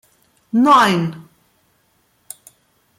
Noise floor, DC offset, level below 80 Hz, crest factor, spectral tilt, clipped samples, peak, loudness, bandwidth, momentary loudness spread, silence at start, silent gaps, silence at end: -61 dBFS; under 0.1%; -62 dBFS; 18 dB; -5 dB/octave; under 0.1%; -2 dBFS; -15 LUFS; 16.5 kHz; 26 LU; 0.55 s; none; 1.8 s